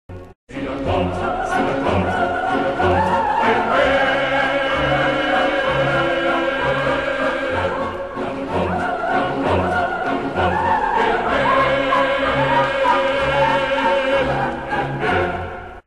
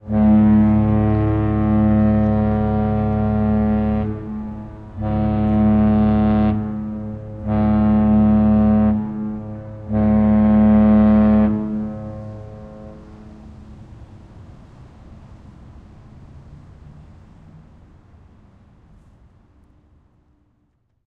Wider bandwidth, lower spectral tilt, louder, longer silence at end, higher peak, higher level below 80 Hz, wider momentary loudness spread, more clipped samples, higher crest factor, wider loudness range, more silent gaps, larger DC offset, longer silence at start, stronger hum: first, 11.5 kHz vs 3.8 kHz; second, -6 dB/octave vs -11.5 dB/octave; about the same, -18 LUFS vs -17 LUFS; second, 0.05 s vs 4.1 s; about the same, -6 dBFS vs -4 dBFS; second, -40 dBFS vs -32 dBFS; second, 6 LU vs 19 LU; neither; about the same, 14 dB vs 14 dB; about the same, 4 LU vs 5 LU; first, 0.35-0.47 s vs none; first, 0.4% vs under 0.1%; about the same, 0.1 s vs 0.05 s; neither